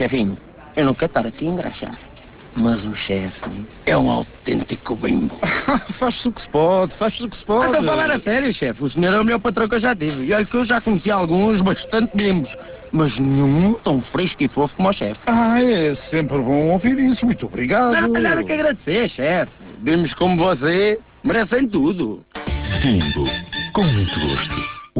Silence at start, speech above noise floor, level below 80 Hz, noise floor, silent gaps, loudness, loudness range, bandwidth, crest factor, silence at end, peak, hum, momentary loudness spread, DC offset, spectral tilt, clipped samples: 0 s; 23 dB; -38 dBFS; -41 dBFS; none; -19 LUFS; 4 LU; 4 kHz; 14 dB; 0 s; -6 dBFS; none; 8 LU; under 0.1%; -10.5 dB/octave; under 0.1%